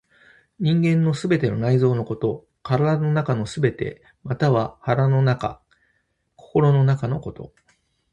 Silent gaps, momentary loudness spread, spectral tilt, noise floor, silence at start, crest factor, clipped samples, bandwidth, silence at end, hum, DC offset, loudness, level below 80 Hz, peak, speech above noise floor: none; 12 LU; -8 dB/octave; -69 dBFS; 0.6 s; 18 dB; under 0.1%; 9.2 kHz; 0.65 s; none; under 0.1%; -21 LUFS; -52 dBFS; -4 dBFS; 49 dB